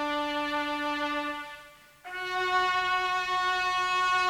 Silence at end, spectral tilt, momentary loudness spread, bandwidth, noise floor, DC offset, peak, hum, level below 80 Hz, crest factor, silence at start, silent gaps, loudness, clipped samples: 0 s; -2 dB/octave; 13 LU; 16.5 kHz; -52 dBFS; under 0.1%; -16 dBFS; none; -60 dBFS; 14 dB; 0 s; none; -28 LUFS; under 0.1%